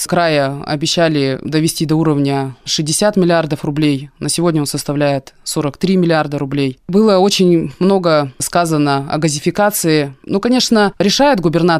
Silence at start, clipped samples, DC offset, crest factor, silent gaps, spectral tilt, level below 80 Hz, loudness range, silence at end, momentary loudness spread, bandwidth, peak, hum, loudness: 0 s; under 0.1%; under 0.1%; 12 dB; none; -5 dB/octave; -46 dBFS; 2 LU; 0 s; 7 LU; 16 kHz; -2 dBFS; none; -14 LUFS